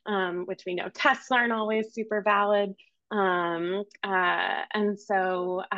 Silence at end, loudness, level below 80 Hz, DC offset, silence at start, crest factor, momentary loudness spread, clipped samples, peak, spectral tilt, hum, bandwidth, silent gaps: 0 s; -27 LUFS; -80 dBFS; under 0.1%; 0.05 s; 18 dB; 9 LU; under 0.1%; -8 dBFS; -5 dB/octave; none; 7.8 kHz; none